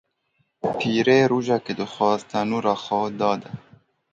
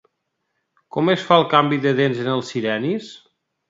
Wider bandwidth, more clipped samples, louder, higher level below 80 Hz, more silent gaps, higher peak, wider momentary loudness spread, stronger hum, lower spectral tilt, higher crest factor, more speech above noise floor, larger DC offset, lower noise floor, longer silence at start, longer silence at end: about the same, 7.8 kHz vs 7.8 kHz; neither; second, -22 LUFS vs -19 LUFS; about the same, -64 dBFS vs -66 dBFS; neither; second, -4 dBFS vs 0 dBFS; about the same, 12 LU vs 12 LU; neither; about the same, -6 dB/octave vs -6 dB/octave; about the same, 18 dB vs 20 dB; second, 48 dB vs 56 dB; neither; second, -70 dBFS vs -75 dBFS; second, 0.65 s vs 0.95 s; about the same, 0.55 s vs 0.55 s